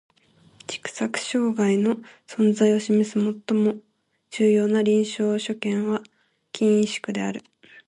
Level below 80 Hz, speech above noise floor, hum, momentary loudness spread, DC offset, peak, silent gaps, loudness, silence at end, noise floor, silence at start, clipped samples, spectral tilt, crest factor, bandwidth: -70 dBFS; 35 dB; none; 14 LU; under 0.1%; -8 dBFS; none; -23 LUFS; 0.45 s; -57 dBFS; 0.7 s; under 0.1%; -5.5 dB/octave; 16 dB; 10.5 kHz